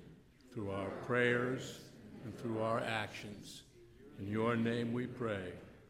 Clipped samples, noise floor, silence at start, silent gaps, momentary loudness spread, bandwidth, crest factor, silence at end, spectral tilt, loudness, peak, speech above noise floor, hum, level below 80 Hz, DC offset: under 0.1%; -60 dBFS; 0 s; none; 18 LU; 15 kHz; 20 dB; 0.05 s; -6 dB/octave; -38 LUFS; -20 dBFS; 22 dB; none; -70 dBFS; under 0.1%